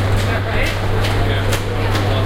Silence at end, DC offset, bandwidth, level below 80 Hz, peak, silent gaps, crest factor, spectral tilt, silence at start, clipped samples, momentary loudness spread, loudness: 0 s; under 0.1%; 16 kHz; -22 dBFS; -2 dBFS; none; 14 dB; -5.5 dB/octave; 0 s; under 0.1%; 2 LU; -18 LUFS